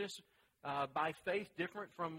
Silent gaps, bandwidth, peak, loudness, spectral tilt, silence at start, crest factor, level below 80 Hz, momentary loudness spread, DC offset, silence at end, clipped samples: none; 16 kHz; -24 dBFS; -42 LUFS; -4.5 dB/octave; 0 s; 18 dB; -80 dBFS; 10 LU; under 0.1%; 0 s; under 0.1%